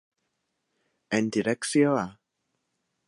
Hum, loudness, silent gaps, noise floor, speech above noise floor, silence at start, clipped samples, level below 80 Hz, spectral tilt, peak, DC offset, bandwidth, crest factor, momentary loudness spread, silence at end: none; -26 LUFS; none; -79 dBFS; 54 dB; 1.1 s; under 0.1%; -70 dBFS; -5 dB/octave; -10 dBFS; under 0.1%; 11.5 kHz; 20 dB; 7 LU; 0.95 s